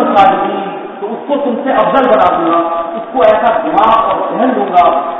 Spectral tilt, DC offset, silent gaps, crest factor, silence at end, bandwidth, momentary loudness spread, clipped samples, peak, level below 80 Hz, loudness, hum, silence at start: -7 dB/octave; under 0.1%; none; 10 dB; 0 s; 7 kHz; 10 LU; 0.4%; 0 dBFS; -46 dBFS; -11 LUFS; none; 0 s